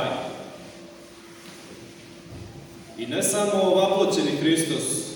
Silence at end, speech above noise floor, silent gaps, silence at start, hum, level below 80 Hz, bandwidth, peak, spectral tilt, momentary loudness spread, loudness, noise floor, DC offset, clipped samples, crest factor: 0 s; 23 dB; none; 0 s; none; -62 dBFS; 19.5 kHz; -8 dBFS; -3.5 dB/octave; 23 LU; -23 LUFS; -45 dBFS; under 0.1%; under 0.1%; 18 dB